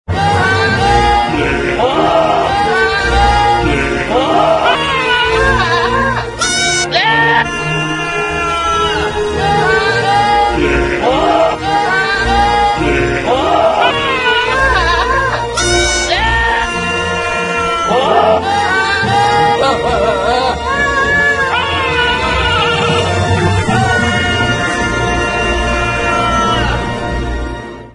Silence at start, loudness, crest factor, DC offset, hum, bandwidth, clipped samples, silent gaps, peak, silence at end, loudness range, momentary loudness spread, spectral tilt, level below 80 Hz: 0.1 s; -12 LUFS; 12 dB; under 0.1%; none; 11 kHz; under 0.1%; none; 0 dBFS; 0.05 s; 1 LU; 4 LU; -4 dB/octave; -26 dBFS